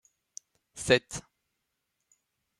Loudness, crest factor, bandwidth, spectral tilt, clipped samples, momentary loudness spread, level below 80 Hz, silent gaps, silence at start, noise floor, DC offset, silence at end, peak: -28 LUFS; 28 dB; 13.5 kHz; -3.5 dB/octave; under 0.1%; 23 LU; -62 dBFS; none; 0.75 s; -82 dBFS; under 0.1%; 1.4 s; -8 dBFS